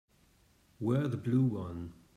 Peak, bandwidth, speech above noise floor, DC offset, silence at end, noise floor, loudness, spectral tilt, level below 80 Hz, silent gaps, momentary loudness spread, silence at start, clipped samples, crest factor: -18 dBFS; 9.8 kHz; 35 dB; under 0.1%; 0.25 s; -67 dBFS; -33 LUFS; -9.5 dB/octave; -66 dBFS; none; 12 LU; 0.8 s; under 0.1%; 16 dB